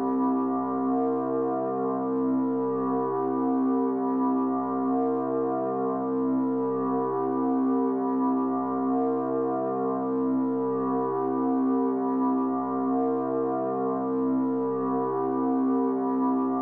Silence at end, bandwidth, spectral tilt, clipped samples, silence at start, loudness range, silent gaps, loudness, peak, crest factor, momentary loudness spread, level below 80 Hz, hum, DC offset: 0 s; 2.4 kHz; -12 dB/octave; under 0.1%; 0 s; 1 LU; none; -26 LUFS; -16 dBFS; 10 dB; 2 LU; -72 dBFS; none; under 0.1%